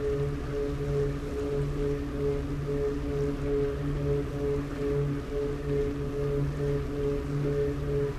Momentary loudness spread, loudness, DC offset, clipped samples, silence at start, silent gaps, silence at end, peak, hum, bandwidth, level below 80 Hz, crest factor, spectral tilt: 3 LU; -31 LUFS; under 0.1%; under 0.1%; 0 s; none; 0 s; -18 dBFS; none; 13.5 kHz; -38 dBFS; 12 dB; -8 dB/octave